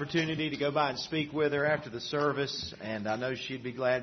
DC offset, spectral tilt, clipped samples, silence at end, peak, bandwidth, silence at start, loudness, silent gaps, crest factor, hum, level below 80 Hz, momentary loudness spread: under 0.1%; -5 dB/octave; under 0.1%; 0 s; -12 dBFS; 6.4 kHz; 0 s; -32 LUFS; none; 18 dB; none; -64 dBFS; 7 LU